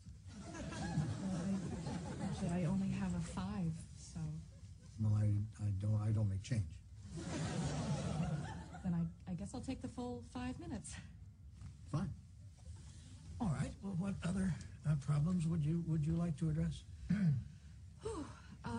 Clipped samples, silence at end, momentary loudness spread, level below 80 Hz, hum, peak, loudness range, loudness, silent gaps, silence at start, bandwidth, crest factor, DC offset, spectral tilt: under 0.1%; 0 s; 18 LU; -56 dBFS; none; -26 dBFS; 8 LU; -41 LUFS; none; 0 s; 10 kHz; 14 dB; under 0.1%; -7 dB/octave